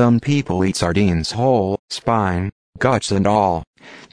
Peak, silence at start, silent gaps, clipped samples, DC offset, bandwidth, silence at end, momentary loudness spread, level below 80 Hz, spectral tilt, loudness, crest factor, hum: -2 dBFS; 0 s; 1.79-1.88 s, 2.52-2.73 s, 3.67-3.74 s; under 0.1%; under 0.1%; 11 kHz; 0.1 s; 7 LU; -40 dBFS; -6 dB/octave; -18 LUFS; 16 dB; none